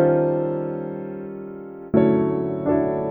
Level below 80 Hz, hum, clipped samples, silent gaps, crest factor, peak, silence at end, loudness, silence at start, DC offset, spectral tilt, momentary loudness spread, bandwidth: -52 dBFS; none; under 0.1%; none; 18 dB; -4 dBFS; 0 s; -22 LUFS; 0 s; under 0.1%; -12.5 dB/octave; 16 LU; 4 kHz